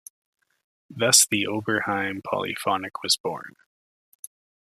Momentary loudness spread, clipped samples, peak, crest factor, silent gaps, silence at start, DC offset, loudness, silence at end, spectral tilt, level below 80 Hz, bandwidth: 27 LU; under 0.1%; -2 dBFS; 24 dB; 3.20-3.24 s; 0.9 s; under 0.1%; -22 LUFS; 1.2 s; -1.5 dB/octave; -72 dBFS; 15 kHz